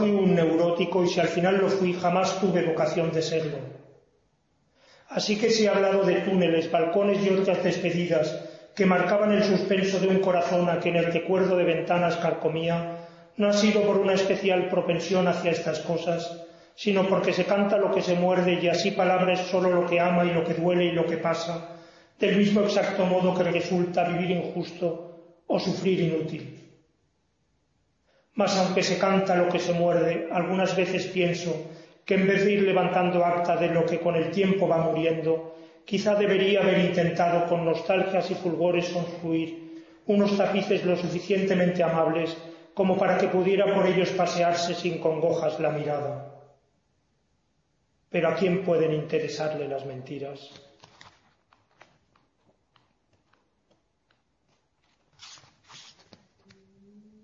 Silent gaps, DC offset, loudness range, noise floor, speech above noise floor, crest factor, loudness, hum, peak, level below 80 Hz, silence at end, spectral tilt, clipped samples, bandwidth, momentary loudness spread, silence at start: none; under 0.1%; 6 LU; -72 dBFS; 48 dB; 18 dB; -25 LUFS; none; -8 dBFS; -68 dBFS; 1.4 s; -6 dB/octave; under 0.1%; 7.6 kHz; 9 LU; 0 s